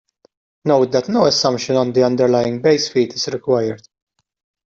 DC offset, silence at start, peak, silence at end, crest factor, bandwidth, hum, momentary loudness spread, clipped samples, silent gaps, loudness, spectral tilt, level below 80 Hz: under 0.1%; 0.65 s; -2 dBFS; 0.95 s; 14 dB; 8 kHz; none; 7 LU; under 0.1%; none; -17 LUFS; -5 dB/octave; -58 dBFS